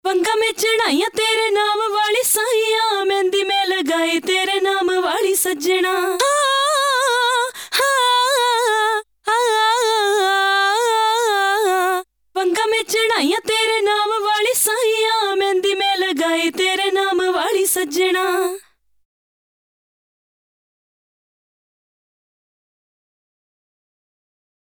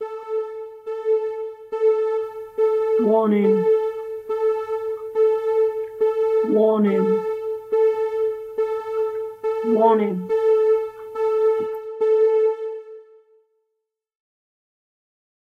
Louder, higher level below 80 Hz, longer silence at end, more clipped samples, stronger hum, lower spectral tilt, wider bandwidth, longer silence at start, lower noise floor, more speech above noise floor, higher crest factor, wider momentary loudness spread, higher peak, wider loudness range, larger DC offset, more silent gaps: first, -17 LUFS vs -21 LUFS; about the same, -66 dBFS vs -68 dBFS; first, 6.05 s vs 2.4 s; neither; neither; second, 0 dB/octave vs -8.5 dB/octave; first, over 20 kHz vs 5 kHz; about the same, 0.05 s vs 0 s; second, -42 dBFS vs -79 dBFS; second, 24 dB vs 61 dB; about the same, 14 dB vs 16 dB; second, 3 LU vs 11 LU; about the same, -4 dBFS vs -4 dBFS; about the same, 3 LU vs 3 LU; neither; neither